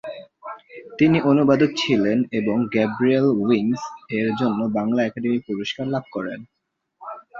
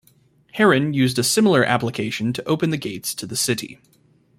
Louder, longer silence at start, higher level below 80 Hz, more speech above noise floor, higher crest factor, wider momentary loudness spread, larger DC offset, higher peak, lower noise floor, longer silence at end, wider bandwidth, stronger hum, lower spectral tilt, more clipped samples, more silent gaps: about the same, -21 LUFS vs -20 LUFS; second, 0.05 s vs 0.55 s; about the same, -60 dBFS vs -58 dBFS; about the same, 36 dB vs 37 dB; about the same, 18 dB vs 18 dB; first, 20 LU vs 10 LU; neither; about the same, -4 dBFS vs -2 dBFS; about the same, -56 dBFS vs -57 dBFS; second, 0 s vs 0.65 s; second, 7.6 kHz vs 16 kHz; neither; first, -6.5 dB/octave vs -4.5 dB/octave; neither; neither